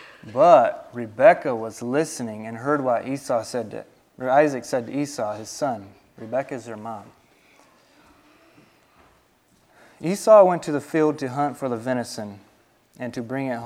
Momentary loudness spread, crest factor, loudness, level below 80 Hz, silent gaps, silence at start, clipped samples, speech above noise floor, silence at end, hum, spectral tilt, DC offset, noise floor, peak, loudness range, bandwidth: 20 LU; 22 dB; -22 LUFS; -68 dBFS; none; 0 s; under 0.1%; 39 dB; 0 s; none; -5.5 dB/octave; under 0.1%; -61 dBFS; 0 dBFS; 15 LU; 14.5 kHz